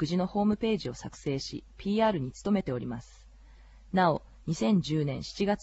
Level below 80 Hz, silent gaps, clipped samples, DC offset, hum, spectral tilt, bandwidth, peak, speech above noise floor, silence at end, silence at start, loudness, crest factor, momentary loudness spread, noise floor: -52 dBFS; none; under 0.1%; under 0.1%; none; -6.5 dB/octave; 8.2 kHz; -14 dBFS; 24 dB; 0 s; 0 s; -30 LUFS; 16 dB; 11 LU; -53 dBFS